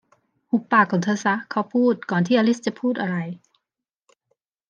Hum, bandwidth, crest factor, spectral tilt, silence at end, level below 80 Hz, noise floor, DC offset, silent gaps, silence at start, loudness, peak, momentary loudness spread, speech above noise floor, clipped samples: none; 7.6 kHz; 20 dB; -6 dB/octave; 1.35 s; -76 dBFS; -85 dBFS; under 0.1%; none; 0.55 s; -22 LUFS; -4 dBFS; 8 LU; 64 dB; under 0.1%